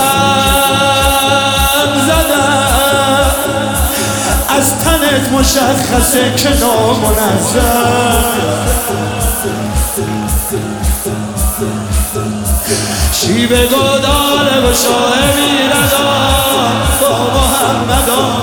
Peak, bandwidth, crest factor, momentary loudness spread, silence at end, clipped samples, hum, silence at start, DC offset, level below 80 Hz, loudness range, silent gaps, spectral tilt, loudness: 0 dBFS; 19 kHz; 12 dB; 6 LU; 0 s; under 0.1%; none; 0 s; 0.3%; -20 dBFS; 5 LU; none; -3.5 dB/octave; -11 LUFS